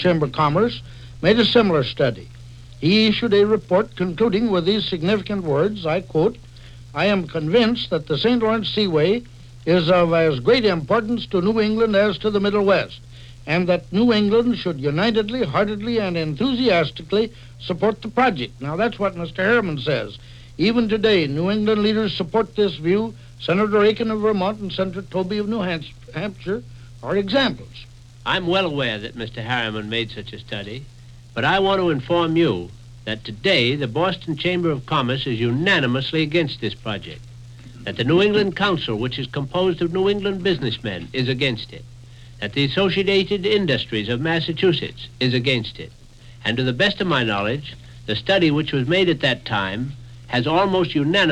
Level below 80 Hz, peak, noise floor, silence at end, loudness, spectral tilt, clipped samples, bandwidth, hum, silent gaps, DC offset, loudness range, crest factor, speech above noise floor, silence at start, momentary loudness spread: -46 dBFS; -2 dBFS; -40 dBFS; 0 s; -20 LUFS; -6.5 dB/octave; under 0.1%; 10 kHz; none; none; under 0.1%; 4 LU; 18 dB; 20 dB; 0 s; 13 LU